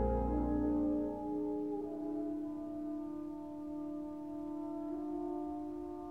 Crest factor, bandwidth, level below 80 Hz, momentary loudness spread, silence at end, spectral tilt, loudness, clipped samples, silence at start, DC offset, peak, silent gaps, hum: 16 dB; 3.4 kHz; -48 dBFS; 9 LU; 0 s; -10 dB/octave; -39 LUFS; under 0.1%; 0 s; under 0.1%; -22 dBFS; none; none